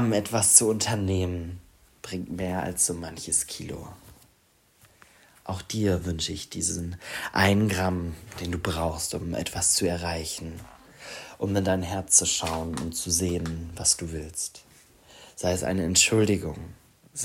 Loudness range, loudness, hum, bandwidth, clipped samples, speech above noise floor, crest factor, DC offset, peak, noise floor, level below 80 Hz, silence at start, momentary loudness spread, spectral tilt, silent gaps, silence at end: 6 LU; -25 LUFS; none; 16 kHz; under 0.1%; 37 dB; 26 dB; under 0.1%; 0 dBFS; -63 dBFS; -52 dBFS; 0 s; 20 LU; -3 dB/octave; none; 0 s